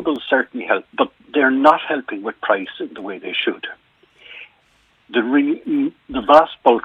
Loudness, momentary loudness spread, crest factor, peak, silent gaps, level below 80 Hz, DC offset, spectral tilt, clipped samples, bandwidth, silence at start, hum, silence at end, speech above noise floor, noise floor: -18 LUFS; 17 LU; 18 dB; 0 dBFS; none; -56 dBFS; under 0.1%; -5.5 dB/octave; under 0.1%; 7.4 kHz; 0 s; none; 0.05 s; 40 dB; -58 dBFS